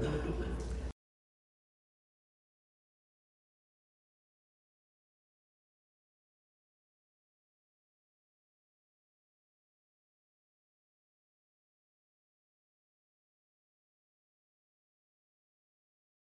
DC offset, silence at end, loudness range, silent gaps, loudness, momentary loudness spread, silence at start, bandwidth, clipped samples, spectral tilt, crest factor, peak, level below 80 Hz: under 0.1%; 15.45 s; 14 LU; none; -40 LUFS; 12 LU; 0 s; 11.5 kHz; under 0.1%; -7 dB/octave; 26 dB; -24 dBFS; -52 dBFS